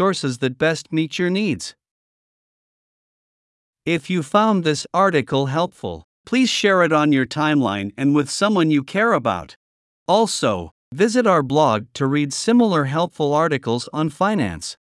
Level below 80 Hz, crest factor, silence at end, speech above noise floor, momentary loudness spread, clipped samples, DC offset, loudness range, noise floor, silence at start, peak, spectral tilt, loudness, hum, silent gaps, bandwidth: -60 dBFS; 18 dB; 0.1 s; over 71 dB; 8 LU; under 0.1%; under 0.1%; 6 LU; under -90 dBFS; 0 s; -2 dBFS; -5 dB/octave; -19 LUFS; none; 1.91-3.73 s, 6.04-6.24 s, 9.56-10.06 s, 10.71-10.91 s; 12 kHz